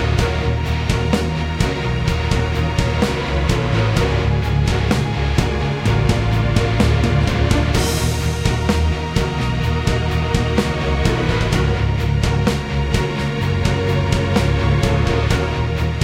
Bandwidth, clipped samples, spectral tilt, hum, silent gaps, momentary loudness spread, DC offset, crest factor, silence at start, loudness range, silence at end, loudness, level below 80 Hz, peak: 16 kHz; under 0.1%; -6 dB/octave; none; none; 3 LU; under 0.1%; 16 dB; 0 s; 1 LU; 0 s; -18 LUFS; -24 dBFS; -2 dBFS